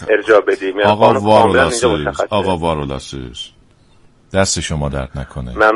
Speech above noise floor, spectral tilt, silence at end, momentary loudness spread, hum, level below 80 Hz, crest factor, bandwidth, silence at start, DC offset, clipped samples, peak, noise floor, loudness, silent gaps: 34 dB; -4.5 dB/octave; 0 s; 16 LU; none; -34 dBFS; 16 dB; 11.5 kHz; 0 s; under 0.1%; under 0.1%; 0 dBFS; -48 dBFS; -14 LUFS; none